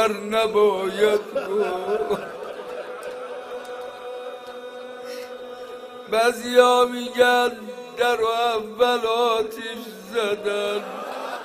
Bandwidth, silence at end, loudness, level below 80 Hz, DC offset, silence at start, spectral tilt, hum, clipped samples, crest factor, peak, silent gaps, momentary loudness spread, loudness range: 15.5 kHz; 0 s; -22 LUFS; -64 dBFS; under 0.1%; 0 s; -3 dB/octave; none; under 0.1%; 22 dB; -2 dBFS; none; 17 LU; 14 LU